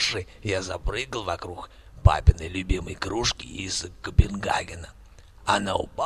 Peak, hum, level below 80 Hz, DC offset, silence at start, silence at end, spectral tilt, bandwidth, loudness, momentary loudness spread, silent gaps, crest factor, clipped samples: -2 dBFS; none; -30 dBFS; under 0.1%; 0 s; 0 s; -4.5 dB/octave; 12 kHz; -26 LUFS; 14 LU; none; 24 dB; under 0.1%